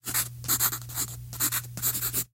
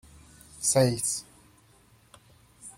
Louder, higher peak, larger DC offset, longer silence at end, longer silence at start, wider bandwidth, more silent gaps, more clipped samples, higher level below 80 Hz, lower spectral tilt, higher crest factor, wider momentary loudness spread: about the same, -27 LUFS vs -26 LUFS; about the same, -10 dBFS vs -10 dBFS; neither; about the same, 0.1 s vs 0.05 s; second, 0.05 s vs 0.55 s; about the same, 17 kHz vs 16.5 kHz; neither; neither; first, -52 dBFS vs -60 dBFS; second, -1.5 dB/octave vs -4 dB/octave; about the same, 20 dB vs 22 dB; second, 7 LU vs 13 LU